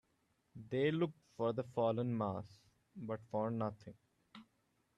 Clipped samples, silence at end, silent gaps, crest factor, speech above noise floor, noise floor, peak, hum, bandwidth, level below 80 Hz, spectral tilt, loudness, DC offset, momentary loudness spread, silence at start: under 0.1%; 0.55 s; none; 18 dB; 41 dB; -79 dBFS; -24 dBFS; none; 10 kHz; -78 dBFS; -8.5 dB/octave; -39 LUFS; under 0.1%; 23 LU; 0.55 s